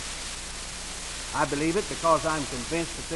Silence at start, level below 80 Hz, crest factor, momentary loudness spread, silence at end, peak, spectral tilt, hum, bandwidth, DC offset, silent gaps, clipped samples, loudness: 0 s; -44 dBFS; 20 dB; 10 LU; 0 s; -8 dBFS; -3 dB/octave; none; 12 kHz; under 0.1%; none; under 0.1%; -28 LUFS